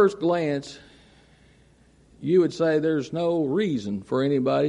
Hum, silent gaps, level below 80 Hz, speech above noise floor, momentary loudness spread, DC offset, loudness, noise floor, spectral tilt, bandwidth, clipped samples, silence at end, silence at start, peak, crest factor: none; none; -62 dBFS; 34 dB; 10 LU; under 0.1%; -24 LUFS; -57 dBFS; -7 dB/octave; 10.5 kHz; under 0.1%; 0 s; 0 s; -8 dBFS; 16 dB